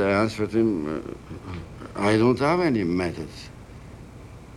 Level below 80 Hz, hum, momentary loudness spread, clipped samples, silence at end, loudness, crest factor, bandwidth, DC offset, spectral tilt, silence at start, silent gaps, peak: -48 dBFS; none; 23 LU; under 0.1%; 0 s; -23 LUFS; 18 dB; 12.5 kHz; under 0.1%; -7 dB/octave; 0 s; none; -8 dBFS